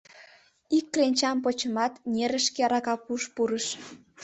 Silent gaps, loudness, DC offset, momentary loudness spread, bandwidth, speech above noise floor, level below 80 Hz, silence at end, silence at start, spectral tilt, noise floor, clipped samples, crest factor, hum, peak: none; -27 LUFS; under 0.1%; 8 LU; 8.4 kHz; 29 dB; -70 dBFS; 0 s; 0.15 s; -2.5 dB/octave; -56 dBFS; under 0.1%; 18 dB; none; -10 dBFS